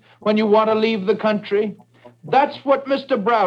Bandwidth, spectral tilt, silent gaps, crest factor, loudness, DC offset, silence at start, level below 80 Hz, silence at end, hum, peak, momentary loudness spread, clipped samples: 6.6 kHz; -7.5 dB/octave; none; 16 dB; -19 LUFS; under 0.1%; 0.25 s; -72 dBFS; 0 s; none; -4 dBFS; 6 LU; under 0.1%